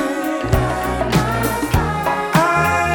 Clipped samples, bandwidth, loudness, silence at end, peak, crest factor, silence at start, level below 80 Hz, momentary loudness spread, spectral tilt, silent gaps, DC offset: under 0.1%; over 20 kHz; -18 LUFS; 0 s; 0 dBFS; 16 dB; 0 s; -30 dBFS; 5 LU; -5.5 dB/octave; none; under 0.1%